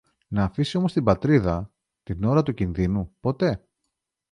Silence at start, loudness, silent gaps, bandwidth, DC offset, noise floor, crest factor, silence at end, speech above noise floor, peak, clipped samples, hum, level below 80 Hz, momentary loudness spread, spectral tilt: 0.3 s; -24 LUFS; none; 10.5 kHz; under 0.1%; -80 dBFS; 20 dB; 0.75 s; 58 dB; -4 dBFS; under 0.1%; none; -42 dBFS; 10 LU; -8 dB/octave